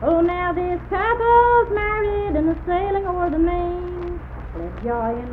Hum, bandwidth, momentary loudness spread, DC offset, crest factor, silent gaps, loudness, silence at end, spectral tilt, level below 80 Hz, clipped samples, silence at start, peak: none; 4.4 kHz; 15 LU; under 0.1%; 16 dB; none; -20 LUFS; 0 s; -9.5 dB/octave; -32 dBFS; under 0.1%; 0 s; -4 dBFS